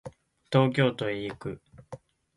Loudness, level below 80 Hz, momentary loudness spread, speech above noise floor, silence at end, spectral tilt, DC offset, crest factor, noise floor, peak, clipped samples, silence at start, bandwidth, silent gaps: -27 LUFS; -62 dBFS; 23 LU; 22 dB; 0.4 s; -7.5 dB/octave; under 0.1%; 20 dB; -48 dBFS; -8 dBFS; under 0.1%; 0.05 s; 11.5 kHz; none